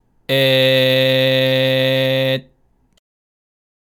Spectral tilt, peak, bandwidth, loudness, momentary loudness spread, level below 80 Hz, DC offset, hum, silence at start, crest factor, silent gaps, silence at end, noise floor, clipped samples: -5.5 dB/octave; -4 dBFS; 18.5 kHz; -15 LUFS; 7 LU; -62 dBFS; under 0.1%; none; 0.3 s; 14 dB; none; 1.55 s; -58 dBFS; under 0.1%